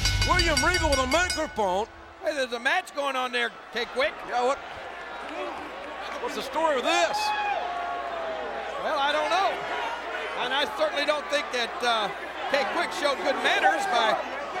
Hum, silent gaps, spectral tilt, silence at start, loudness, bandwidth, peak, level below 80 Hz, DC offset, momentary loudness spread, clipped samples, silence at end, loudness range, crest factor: none; none; -3 dB/octave; 0 s; -26 LUFS; 17 kHz; -8 dBFS; -42 dBFS; under 0.1%; 11 LU; under 0.1%; 0 s; 4 LU; 18 dB